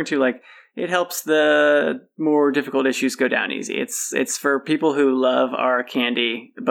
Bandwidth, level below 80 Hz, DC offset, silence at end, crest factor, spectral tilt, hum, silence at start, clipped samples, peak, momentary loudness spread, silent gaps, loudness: 18.5 kHz; under -90 dBFS; under 0.1%; 0 s; 14 dB; -3 dB/octave; none; 0 s; under 0.1%; -6 dBFS; 8 LU; none; -20 LUFS